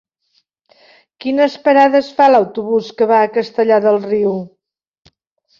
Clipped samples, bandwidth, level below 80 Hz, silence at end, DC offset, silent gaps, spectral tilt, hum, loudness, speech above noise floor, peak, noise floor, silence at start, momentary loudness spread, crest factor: under 0.1%; 7.2 kHz; -62 dBFS; 1.15 s; under 0.1%; none; -6.5 dB/octave; none; -14 LUFS; 50 dB; -2 dBFS; -63 dBFS; 1.25 s; 9 LU; 14 dB